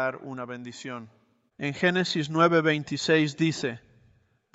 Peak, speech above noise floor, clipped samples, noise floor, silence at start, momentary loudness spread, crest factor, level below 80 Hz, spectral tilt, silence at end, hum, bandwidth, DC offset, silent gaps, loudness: -8 dBFS; 37 dB; under 0.1%; -64 dBFS; 0 s; 17 LU; 18 dB; -68 dBFS; -5 dB/octave; 0.75 s; none; 8.2 kHz; under 0.1%; none; -25 LUFS